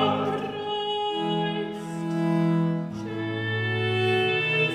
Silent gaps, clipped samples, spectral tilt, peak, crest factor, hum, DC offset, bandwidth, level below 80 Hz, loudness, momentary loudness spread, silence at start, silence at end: none; under 0.1%; -6.5 dB/octave; -12 dBFS; 14 dB; none; under 0.1%; 11 kHz; -66 dBFS; -26 LUFS; 8 LU; 0 s; 0 s